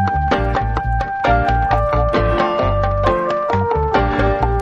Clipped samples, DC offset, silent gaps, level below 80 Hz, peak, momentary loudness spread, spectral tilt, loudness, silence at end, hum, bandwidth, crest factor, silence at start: under 0.1%; under 0.1%; none; -24 dBFS; -2 dBFS; 3 LU; -7.5 dB/octave; -17 LUFS; 0 s; none; 7.4 kHz; 14 dB; 0 s